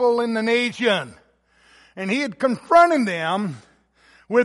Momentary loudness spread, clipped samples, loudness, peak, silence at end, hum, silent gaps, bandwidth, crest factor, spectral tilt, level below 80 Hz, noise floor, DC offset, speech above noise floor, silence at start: 15 LU; under 0.1%; -20 LUFS; -4 dBFS; 0 s; none; none; 11.5 kHz; 18 dB; -5 dB/octave; -66 dBFS; -58 dBFS; under 0.1%; 38 dB; 0 s